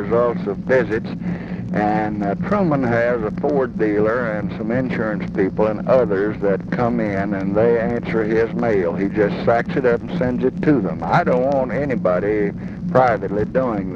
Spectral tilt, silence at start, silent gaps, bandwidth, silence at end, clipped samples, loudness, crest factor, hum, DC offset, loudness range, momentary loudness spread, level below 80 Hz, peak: -9 dB/octave; 0 s; none; 7 kHz; 0 s; under 0.1%; -19 LUFS; 18 dB; none; under 0.1%; 1 LU; 6 LU; -42 dBFS; -2 dBFS